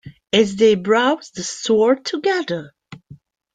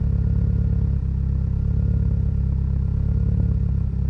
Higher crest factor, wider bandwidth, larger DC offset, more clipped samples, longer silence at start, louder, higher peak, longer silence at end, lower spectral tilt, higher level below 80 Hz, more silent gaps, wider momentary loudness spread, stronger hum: first, 18 dB vs 10 dB; first, 9.4 kHz vs 2.6 kHz; neither; neither; about the same, 0.05 s vs 0 s; first, -18 LUFS vs -22 LUFS; first, -2 dBFS vs -10 dBFS; first, 0.4 s vs 0 s; second, -4 dB/octave vs -11.5 dB/octave; second, -60 dBFS vs -24 dBFS; neither; first, 11 LU vs 2 LU; neither